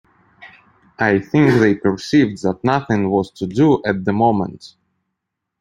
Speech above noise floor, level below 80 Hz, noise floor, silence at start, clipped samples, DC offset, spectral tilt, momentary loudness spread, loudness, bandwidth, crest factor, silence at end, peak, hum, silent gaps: 62 dB; -52 dBFS; -78 dBFS; 0.4 s; under 0.1%; under 0.1%; -7.5 dB/octave; 6 LU; -17 LUFS; 10 kHz; 16 dB; 0.95 s; -2 dBFS; none; none